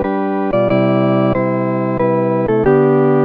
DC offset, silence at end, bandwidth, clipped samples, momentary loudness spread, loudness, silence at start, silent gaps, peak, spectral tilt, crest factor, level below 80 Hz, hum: under 0.1%; 0 s; 4.9 kHz; under 0.1%; 5 LU; -14 LUFS; 0 s; none; -2 dBFS; -10.5 dB/octave; 12 dB; -40 dBFS; none